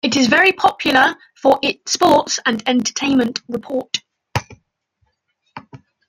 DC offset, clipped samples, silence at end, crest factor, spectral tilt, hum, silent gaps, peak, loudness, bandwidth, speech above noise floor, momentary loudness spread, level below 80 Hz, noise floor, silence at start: under 0.1%; under 0.1%; 0.35 s; 16 dB; -3 dB/octave; none; none; -2 dBFS; -16 LUFS; 16.5 kHz; 52 dB; 13 LU; -56 dBFS; -68 dBFS; 0.05 s